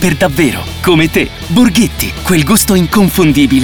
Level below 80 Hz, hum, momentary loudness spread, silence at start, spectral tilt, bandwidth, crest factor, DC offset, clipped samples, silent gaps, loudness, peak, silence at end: -26 dBFS; none; 5 LU; 0 s; -4.5 dB/octave; over 20 kHz; 10 dB; 2%; under 0.1%; none; -10 LUFS; 0 dBFS; 0 s